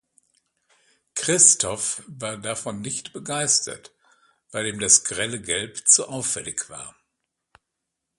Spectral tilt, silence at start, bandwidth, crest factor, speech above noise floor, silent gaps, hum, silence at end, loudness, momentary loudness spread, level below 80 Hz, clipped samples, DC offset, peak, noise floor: -1 dB/octave; 1.15 s; 12 kHz; 26 dB; 58 dB; none; none; 1.3 s; -20 LUFS; 18 LU; -60 dBFS; under 0.1%; under 0.1%; 0 dBFS; -82 dBFS